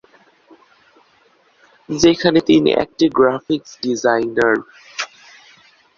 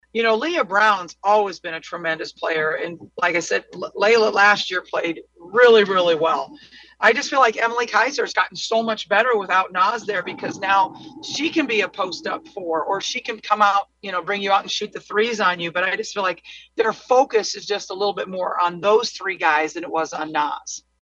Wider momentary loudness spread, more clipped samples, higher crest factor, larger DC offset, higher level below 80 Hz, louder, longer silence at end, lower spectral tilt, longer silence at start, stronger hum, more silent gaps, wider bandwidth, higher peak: first, 14 LU vs 10 LU; neither; about the same, 18 dB vs 20 dB; neither; first, -52 dBFS vs -66 dBFS; first, -17 LUFS vs -20 LUFS; first, 0.9 s vs 0.2 s; first, -4.5 dB/octave vs -2.5 dB/octave; first, 1.9 s vs 0.15 s; neither; neither; second, 7.4 kHz vs 8.2 kHz; about the same, -2 dBFS vs 0 dBFS